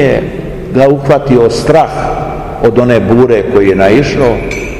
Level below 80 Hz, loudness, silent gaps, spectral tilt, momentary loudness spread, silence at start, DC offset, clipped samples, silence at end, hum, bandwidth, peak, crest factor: -26 dBFS; -9 LUFS; none; -7 dB/octave; 8 LU; 0 s; 0.7%; 4%; 0 s; none; 12.5 kHz; 0 dBFS; 8 dB